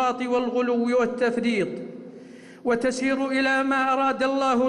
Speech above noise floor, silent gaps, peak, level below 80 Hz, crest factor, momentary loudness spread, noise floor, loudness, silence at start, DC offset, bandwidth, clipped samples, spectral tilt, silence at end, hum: 21 dB; none; -14 dBFS; -62 dBFS; 10 dB; 14 LU; -44 dBFS; -23 LUFS; 0 s; under 0.1%; 11 kHz; under 0.1%; -4.5 dB/octave; 0 s; none